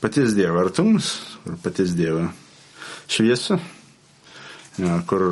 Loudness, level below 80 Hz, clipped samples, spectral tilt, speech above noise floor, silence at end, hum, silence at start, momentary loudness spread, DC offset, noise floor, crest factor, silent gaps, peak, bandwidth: -21 LUFS; -58 dBFS; under 0.1%; -5.5 dB/octave; 30 dB; 0 s; none; 0 s; 20 LU; under 0.1%; -51 dBFS; 18 dB; none; -4 dBFS; 11.5 kHz